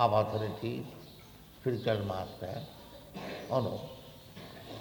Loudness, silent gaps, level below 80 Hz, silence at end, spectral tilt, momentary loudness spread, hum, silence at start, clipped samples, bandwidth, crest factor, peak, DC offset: -35 LUFS; none; -62 dBFS; 0 s; -7 dB/octave; 18 LU; none; 0 s; under 0.1%; 19.5 kHz; 22 dB; -12 dBFS; under 0.1%